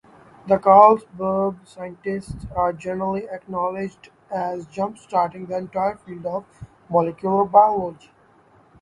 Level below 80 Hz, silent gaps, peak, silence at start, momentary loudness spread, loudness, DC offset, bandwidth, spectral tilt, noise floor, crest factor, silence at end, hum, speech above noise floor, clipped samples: -52 dBFS; none; 0 dBFS; 0.45 s; 17 LU; -21 LUFS; under 0.1%; 11.5 kHz; -8 dB/octave; -55 dBFS; 22 dB; 0.85 s; none; 34 dB; under 0.1%